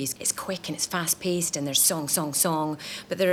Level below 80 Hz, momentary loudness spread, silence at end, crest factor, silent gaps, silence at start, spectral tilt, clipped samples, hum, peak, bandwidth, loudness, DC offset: -66 dBFS; 10 LU; 0 s; 18 dB; none; 0 s; -2.5 dB/octave; under 0.1%; none; -10 dBFS; over 20 kHz; -25 LUFS; under 0.1%